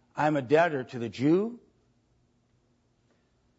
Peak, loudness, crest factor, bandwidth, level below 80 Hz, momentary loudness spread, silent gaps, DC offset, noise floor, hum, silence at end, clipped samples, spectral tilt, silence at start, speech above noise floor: -10 dBFS; -27 LUFS; 20 dB; 8 kHz; -72 dBFS; 11 LU; none; under 0.1%; -69 dBFS; none; 2 s; under 0.1%; -7 dB/octave; 0.15 s; 43 dB